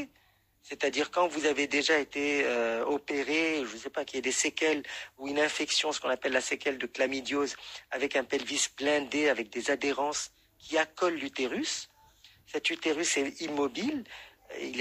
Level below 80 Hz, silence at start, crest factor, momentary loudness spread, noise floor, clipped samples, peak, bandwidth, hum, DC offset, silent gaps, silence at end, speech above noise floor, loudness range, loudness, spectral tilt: -70 dBFS; 0 s; 18 dB; 10 LU; -67 dBFS; under 0.1%; -12 dBFS; 15.5 kHz; none; under 0.1%; none; 0 s; 36 dB; 3 LU; -30 LUFS; -1.5 dB/octave